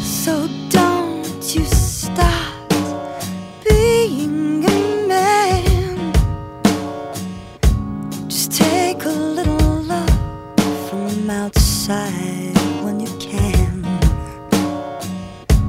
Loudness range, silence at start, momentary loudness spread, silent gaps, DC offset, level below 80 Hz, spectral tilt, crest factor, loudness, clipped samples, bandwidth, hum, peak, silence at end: 3 LU; 0 s; 11 LU; none; under 0.1%; -24 dBFS; -5 dB/octave; 18 dB; -18 LUFS; under 0.1%; 16.5 kHz; none; 0 dBFS; 0 s